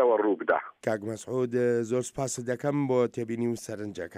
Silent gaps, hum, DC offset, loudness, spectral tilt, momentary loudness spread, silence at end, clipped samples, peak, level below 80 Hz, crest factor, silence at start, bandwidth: none; none; under 0.1%; -29 LUFS; -6 dB/octave; 7 LU; 0 s; under 0.1%; -10 dBFS; -68 dBFS; 18 dB; 0 s; 15.5 kHz